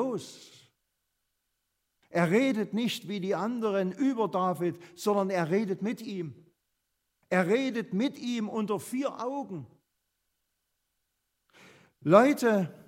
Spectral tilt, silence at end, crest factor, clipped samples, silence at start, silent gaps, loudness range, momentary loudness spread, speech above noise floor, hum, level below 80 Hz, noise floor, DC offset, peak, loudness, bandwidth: -6 dB/octave; 0.1 s; 26 dB; under 0.1%; 0 s; none; 7 LU; 13 LU; 52 dB; none; -80 dBFS; -81 dBFS; under 0.1%; -6 dBFS; -29 LUFS; 16 kHz